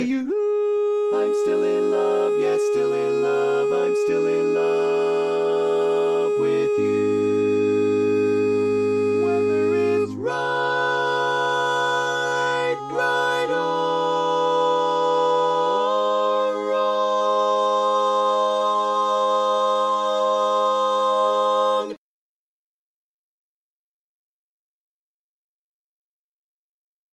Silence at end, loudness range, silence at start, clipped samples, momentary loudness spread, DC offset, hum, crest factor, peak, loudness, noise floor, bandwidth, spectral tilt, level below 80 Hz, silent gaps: 5.15 s; 2 LU; 0 s; under 0.1%; 2 LU; under 0.1%; none; 12 dB; -10 dBFS; -21 LUFS; under -90 dBFS; 11.5 kHz; -4.5 dB/octave; -70 dBFS; none